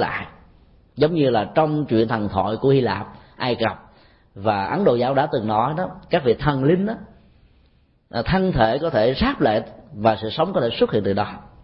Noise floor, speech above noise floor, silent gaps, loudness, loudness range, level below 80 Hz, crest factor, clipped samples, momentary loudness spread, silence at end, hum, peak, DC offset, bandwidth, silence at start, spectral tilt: -58 dBFS; 38 dB; none; -21 LUFS; 2 LU; -44 dBFS; 18 dB; under 0.1%; 9 LU; 0.15 s; none; -4 dBFS; under 0.1%; 5.8 kHz; 0 s; -11.5 dB/octave